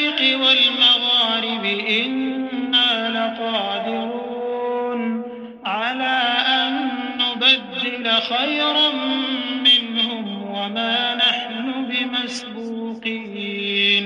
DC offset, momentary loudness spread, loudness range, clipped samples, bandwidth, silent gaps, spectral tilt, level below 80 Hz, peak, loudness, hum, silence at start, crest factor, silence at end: under 0.1%; 13 LU; 5 LU; under 0.1%; 10 kHz; none; -3.5 dB/octave; -70 dBFS; -4 dBFS; -18 LUFS; none; 0 s; 16 dB; 0 s